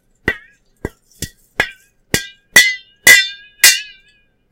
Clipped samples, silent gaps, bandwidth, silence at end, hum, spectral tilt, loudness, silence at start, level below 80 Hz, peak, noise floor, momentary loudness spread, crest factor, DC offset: 0.6%; none; over 20 kHz; 0.7 s; none; 0 dB/octave; -12 LUFS; 0.25 s; -44 dBFS; 0 dBFS; -55 dBFS; 23 LU; 16 dB; under 0.1%